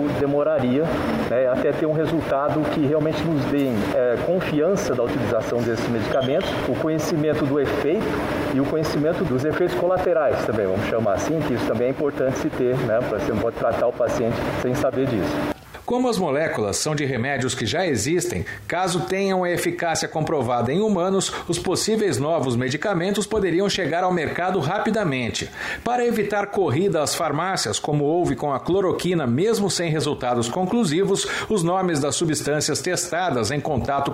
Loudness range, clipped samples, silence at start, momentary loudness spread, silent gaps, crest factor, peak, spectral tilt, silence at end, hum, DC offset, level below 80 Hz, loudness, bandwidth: 1 LU; under 0.1%; 0 s; 3 LU; none; 14 dB; -6 dBFS; -5 dB/octave; 0 s; none; under 0.1%; -46 dBFS; -22 LUFS; 16 kHz